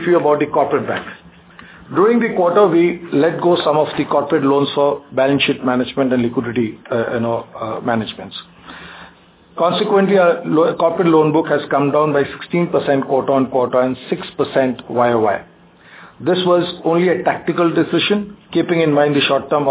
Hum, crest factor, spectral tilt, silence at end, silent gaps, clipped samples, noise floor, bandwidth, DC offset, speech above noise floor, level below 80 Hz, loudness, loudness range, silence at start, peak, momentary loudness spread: none; 16 dB; -10.5 dB/octave; 0 s; none; under 0.1%; -46 dBFS; 4 kHz; under 0.1%; 31 dB; -56 dBFS; -16 LUFS; 5 LU; 0 s; 0 dBFS; 10 LU